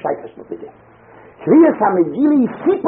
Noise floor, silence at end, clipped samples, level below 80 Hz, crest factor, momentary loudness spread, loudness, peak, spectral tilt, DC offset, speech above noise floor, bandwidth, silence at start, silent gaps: -44 dBFS; 0 s; under 0.1%; -60 dBFS; 14 dB; 21 LU; -14 LUFS; -2 dBFS; -8 dB/octave; under 0.1%; 31 dB; 3.8 kHz; 0.05 s; none